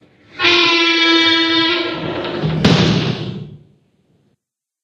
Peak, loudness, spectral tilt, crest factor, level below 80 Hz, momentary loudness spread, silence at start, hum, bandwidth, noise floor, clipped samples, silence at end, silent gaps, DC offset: 0 dBFS; -13 LUFS; -4.5 dB/octave; 16 dB; -44 dBFS; 12 LU; 0.35 s; none; 8.8 kHz; -72 dBFS; under 0.1%; 1.3 s; none; under 0.1%